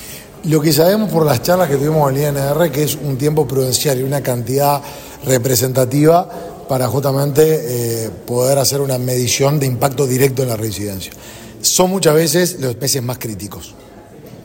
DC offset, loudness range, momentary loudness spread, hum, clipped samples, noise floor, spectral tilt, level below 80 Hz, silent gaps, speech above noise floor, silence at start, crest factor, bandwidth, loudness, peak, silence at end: under 0.1%; 2 LU; 13 LU; none; under 0.1%; -37 dBFS; -5 dB/octave; -46 dBFS; none; 22 dB; 0 s; 16 dB; 16.5 kHz; -15 LUFS; 0 dBFS; 0 s